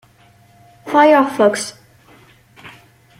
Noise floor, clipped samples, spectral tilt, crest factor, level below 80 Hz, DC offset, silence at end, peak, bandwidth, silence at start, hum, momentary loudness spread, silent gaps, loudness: -50 dBFS; under 0.1%; -4 dB/octave; 16 dB; -62 dBFS; under 0.1%; 0.5 s; -2 dBFS; 15.5 kHz; 0.85 s; none; 17 LU; none; -14 LUFS